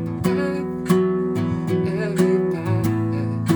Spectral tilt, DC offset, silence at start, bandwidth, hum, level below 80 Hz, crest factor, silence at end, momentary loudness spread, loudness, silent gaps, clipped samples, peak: -7.5 dB/octave; under 0.1%; 0 s; over 20 kHz; none; -50 dBFS; 16 dB; 0 s; 4 LU; -21 LUFS; none; under 0.1%; -4 dBFS